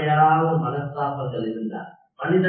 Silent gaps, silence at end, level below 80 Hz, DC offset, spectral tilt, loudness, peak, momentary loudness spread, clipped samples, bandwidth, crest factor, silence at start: none; 0 s; -62 dBFS; under 0.1%; -12 dB/octave; -23 LUFS; -6 dBFS; 14 LU; under 0.1%; 4.5 kHz; 16 dB; 0 s